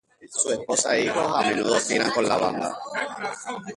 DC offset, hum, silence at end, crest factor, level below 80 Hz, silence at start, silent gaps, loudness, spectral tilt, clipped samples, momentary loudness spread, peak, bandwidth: under 0.1%; none; 0 s; 18 dB; -62 dBFS; 0.2 s; none; -24 LUFS; -2.5 dB/octave; under 0.1%; 9 LU; -6 dBFS; 11.5 kHz